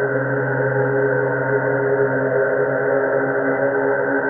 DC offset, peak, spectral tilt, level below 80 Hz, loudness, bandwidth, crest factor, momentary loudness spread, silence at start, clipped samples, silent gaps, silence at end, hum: under 0.1%; -6 dBFS; -2 dB/octave; -62 dBFS; -19 LUFS; 3.2 kHz; 12 dB; 1 LU; 0 s; under 0.1%; none; 0 s; none